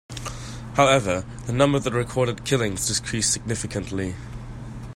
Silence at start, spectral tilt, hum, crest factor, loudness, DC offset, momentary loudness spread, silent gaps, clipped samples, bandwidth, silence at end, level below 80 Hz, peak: 0.1 s; -4 dB/octave; none; 22 dB; -23 LUFS; under 0.1%; 17 LU; none; under 0.1%; 16 kHz; 0 s; -42 dBFS; -2 dBFS